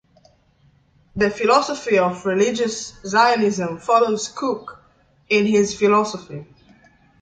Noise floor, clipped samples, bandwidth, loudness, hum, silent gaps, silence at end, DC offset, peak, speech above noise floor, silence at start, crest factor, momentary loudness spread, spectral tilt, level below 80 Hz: -57 dBFS; under 0.1%; 9.4 kHz; -19 LUFS; none; none; 0.8 s; under 0.1%; -2 dBFS; 39 dB; 1.15 s; 18 dB; 14 LU; -4 dB/octave; -56 dBFS